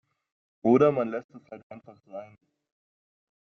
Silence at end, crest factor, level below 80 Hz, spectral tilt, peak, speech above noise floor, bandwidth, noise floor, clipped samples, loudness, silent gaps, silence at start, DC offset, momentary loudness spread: 1.2 s; 20 dB; -72 dBFS; -7.5 dB/octave; -8 dBFS; over 63 dB; 6.4 kHz; under -90 dBFS; under 0.1%; -24 LUFS; 1.24-1.29 s, 1.63-1.70 s; 0.65 s; under 0.1%; 25 LU